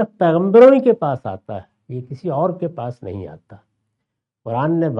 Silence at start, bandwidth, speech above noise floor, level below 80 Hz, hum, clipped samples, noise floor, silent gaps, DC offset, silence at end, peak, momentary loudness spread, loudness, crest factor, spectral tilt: 0 s; 5.6 kHz; 62 dB; -62 dBFS; none; under 0.1%; -78 dBFS; none; under 0.1%; 0 s; 0 dBFS; 23 LU; -15 LUFS; 18 dB; -9.5 dB/octave